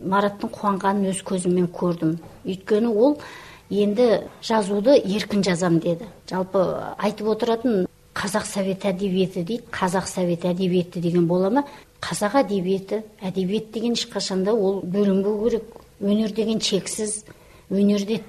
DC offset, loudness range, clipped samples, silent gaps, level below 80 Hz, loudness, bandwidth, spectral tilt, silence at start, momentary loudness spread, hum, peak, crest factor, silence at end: under 0.1%; 3 LU; under 0.1%; none; -56 dBFS; -23 LUFS; 13.5 kHz; -5.5 dB/octave; 0 s; 9 LU; none; -6 dBFS; 16 dB; 0 s